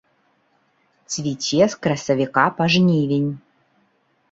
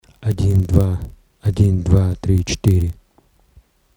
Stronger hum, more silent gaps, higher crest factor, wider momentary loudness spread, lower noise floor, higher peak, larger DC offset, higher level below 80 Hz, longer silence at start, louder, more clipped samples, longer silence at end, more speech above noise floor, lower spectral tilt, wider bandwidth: neither; neither; about the same, 20 dB vs 16 dB; about the same, 10 LU vs 10 LU; first, -64 dBFS vs -56 dBFS; about the same, -2 dBFS vs -2 dBFS; neither; second, -60 dBFS vs -30 dBFS; first, 1.1 s vs 0.2 s; about the same, -19 LUFS vs -18 LUFS; neither; about the same, 0.95 s vs 1.05 s; first, 45 dB vs 40 dB; second, -5 dB/octave vs -7 dB/octave; second, 8 kHz vs 12 kHz